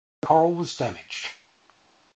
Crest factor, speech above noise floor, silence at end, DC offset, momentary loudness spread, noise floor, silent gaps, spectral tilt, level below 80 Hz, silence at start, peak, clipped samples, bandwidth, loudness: 20 dB; 37 dB; 0.8 s; under 0.1%; 13 LU; -60 dBFS; none; -5.5 dB/octave; -62 dBFS; 0.25 s; -6 dBFS; under 0.1%; 8.8 kHz; -24 LUFS